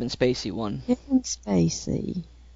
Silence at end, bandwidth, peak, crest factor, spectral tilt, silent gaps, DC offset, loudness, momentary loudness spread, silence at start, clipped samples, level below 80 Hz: 0 s; 7.8 kHz; -10 dBFS; 16 dB; -5.5 dB/octave; none; under 0.1%; -26 LUFS; 7 LU; 0 s; under 0.1%; -46 dBFS